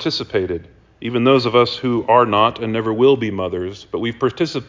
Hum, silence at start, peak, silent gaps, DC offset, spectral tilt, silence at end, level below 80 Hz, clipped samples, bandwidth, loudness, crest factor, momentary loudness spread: none; 0 s; -2 dBFS; none; under 0.1%; -6.5 dB/octave; 0.05 s; -48 dBFS; under 0.1%; 7.6 kHz; -17 LUFS; 16 dB; 12 LU